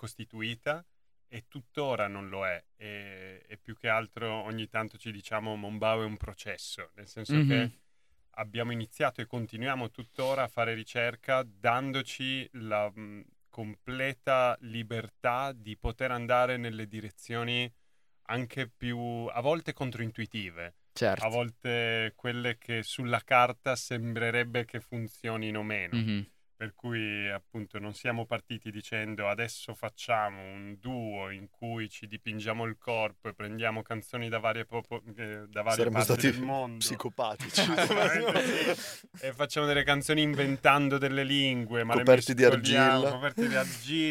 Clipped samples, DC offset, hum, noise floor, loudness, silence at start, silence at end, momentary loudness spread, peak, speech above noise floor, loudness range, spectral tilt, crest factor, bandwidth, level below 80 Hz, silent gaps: under 0.1%; under 0.1%; none; -73 dBFS; -31 LUFS; 0 s; 0 s; 15 LU; -8 dBFS; 42 dB; 9 LU; -4.5 dB/octave; 24 dB; 16.5 kHz; -60 dBFS; none